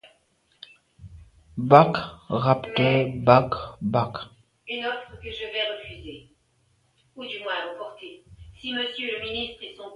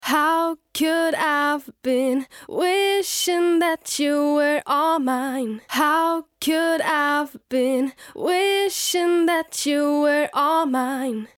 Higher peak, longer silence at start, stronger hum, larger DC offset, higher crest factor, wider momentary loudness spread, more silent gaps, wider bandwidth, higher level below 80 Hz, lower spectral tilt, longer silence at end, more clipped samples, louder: first, 0 dBFS vs -8 dBFS; first, 1 s vs 0 s; neither; neither; first, 26 dB vs 12 dB; first, 21 LU vs 6 LU; neither; second, 11 kHz vs 17.5 kHz; first, -54 dBFS vs -68 dBFS; first, -7.5 dB/octave vs -2 dB/octave; second, 0 s vs 0.15 s; neither; second, -24 LUFS vs -21 LUFS